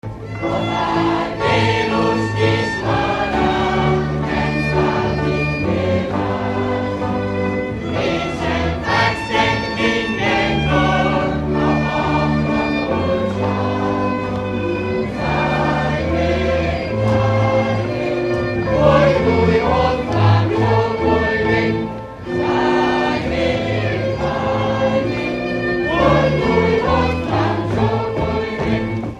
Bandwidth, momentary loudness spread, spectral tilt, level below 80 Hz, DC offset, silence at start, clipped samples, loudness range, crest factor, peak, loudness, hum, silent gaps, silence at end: 10 kHz; 6 LU; -7 dB/octave; -34 dBFS; under 0.1%; 0.05 s; under 0.1%; 3 LU; 16 dB; 0 dBFS; -18 LUFS; none; none; 0 s